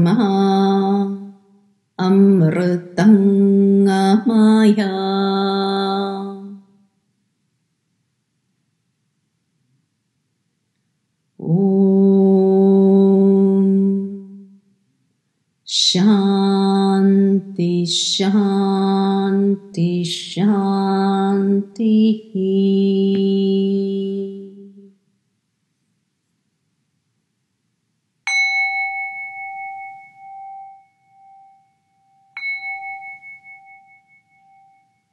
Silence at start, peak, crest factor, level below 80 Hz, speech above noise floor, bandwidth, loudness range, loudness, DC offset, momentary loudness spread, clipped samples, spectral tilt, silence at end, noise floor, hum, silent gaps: 0 s; -2 dBFS; 16 dB; -72 dBFS; 57 dB; 11 kHz; 17 LU; -16 LUFS; under 0.1%; 18 LU; under 0.1%; -6 dB/octave; 1.6 s; -71 dBFS; none; none